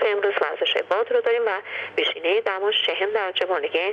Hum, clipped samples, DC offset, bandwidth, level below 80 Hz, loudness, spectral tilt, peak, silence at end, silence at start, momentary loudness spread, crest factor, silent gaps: none; under 0.1%; under 0.1%; 7 kHz; -80 dBFS; -22 LUFS; -3 dB/octave; -8 dBFS; 0 s; 0 s; 3 LU; 14 dB; none